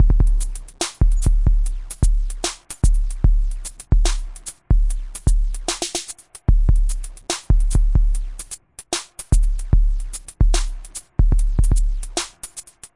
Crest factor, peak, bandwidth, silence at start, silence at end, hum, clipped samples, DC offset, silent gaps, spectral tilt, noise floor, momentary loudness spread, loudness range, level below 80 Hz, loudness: 14 dB; -2 dBFS; 11.5 kHz; 0 s; 0.1 s; none; under 0.1%; under 0.1%; none; -4.5 dB/octave; -40 dBFS; 12 LU; 1 LU; -18 dBFS; -22 LUFS